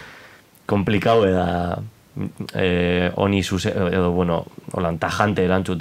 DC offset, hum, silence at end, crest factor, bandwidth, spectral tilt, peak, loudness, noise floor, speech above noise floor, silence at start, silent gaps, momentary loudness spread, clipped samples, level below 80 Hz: 0.2%; none; 0 s; 20 dB; 15.5 kHz; -6.5 dB/octave; 0 dBFS; -21 LUFS; -48 dBFS; 28 dB; 0 s; none; 13 LU; under 0.1%; -46 dBFS